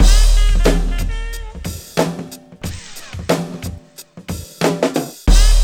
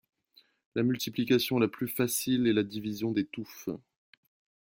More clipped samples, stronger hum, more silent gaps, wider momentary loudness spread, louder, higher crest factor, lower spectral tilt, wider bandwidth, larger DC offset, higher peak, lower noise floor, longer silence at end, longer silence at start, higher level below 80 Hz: neither; neither; neither; first, 17 LU vs 12 LU; first, -19 LUFS vs -30 LUFS; about the same, 14 dB vs 18 dB; about the same, -4.5 dB/octave vs -5 dB/octave; about the same, 15.5 kHz vs 17 kHz; neither; first, 0 dBFS vs -12 dBFS; second, -39 dBFS vs -65 dBFS; second, 0 s vs 0.95 s; second, 0 s vs 0.75 s; first, -16 dBFS vs -68 dBFS